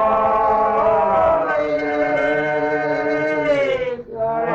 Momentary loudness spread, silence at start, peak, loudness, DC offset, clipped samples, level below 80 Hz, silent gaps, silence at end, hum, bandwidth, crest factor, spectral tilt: 5 LU; 0 s; -8 dBFS; -18 LUFS; under 0.1%; under 0.1%; -46 dBFS; none; 0 s; none; 7.6 kHz; 10 dB; -6.5 dB/octave